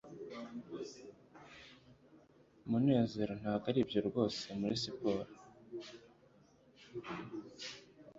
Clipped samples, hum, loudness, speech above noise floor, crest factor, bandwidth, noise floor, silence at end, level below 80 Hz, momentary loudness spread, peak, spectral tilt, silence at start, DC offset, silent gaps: under 0.1%; none; -38 LUFS; 30 dB; 22 dB; 7.6 kHz; -66 dBFS; 0 s; -70 dBFS; 22 LU; -18 dBFS; -6 dB/octave; 0.05 s; under 0.1%; none